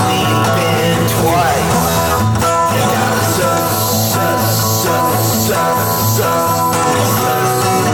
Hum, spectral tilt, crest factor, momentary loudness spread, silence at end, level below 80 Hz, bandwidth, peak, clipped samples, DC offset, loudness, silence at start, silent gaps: none; -4 dB/octave; 12 dB; 1 LU; 0 s; -40 dBFS; over 20 kHz; -2 dBFS; under 0.1%; under 0.1%; -13 LUFS; 0 s; none